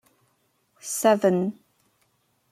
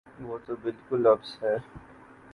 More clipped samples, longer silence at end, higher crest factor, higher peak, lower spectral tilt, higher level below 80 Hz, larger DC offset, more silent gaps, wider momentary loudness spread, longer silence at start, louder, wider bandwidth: neither; first, 1 s vs 0.55 s; about the same, 20 dB vs 22 dB; about the same, -6 dBFS vs -8 dBFS; second, -5 dB/octave vs -7.5 dB/octave; second, -74 dBFS vs -62 dBFS; neither; neither; second, 13 LU vs 19 LU; first, 0.85 s vs 0.2 s; first, -23 LUFS vs -28 LUFS; first, 16 kHz vs 11 kHz